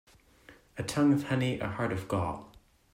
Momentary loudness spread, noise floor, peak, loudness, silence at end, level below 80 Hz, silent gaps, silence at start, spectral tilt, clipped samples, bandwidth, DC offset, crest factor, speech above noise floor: 13 LU; -58 dBFS; -16 dBFS; -31 LUFS; 0.45 s; -58 dBFS; none; 0.5 s; -6.5 dB/octave; under 0.1%; 16 kHz; under 0.1%; 16 dB; 28 dB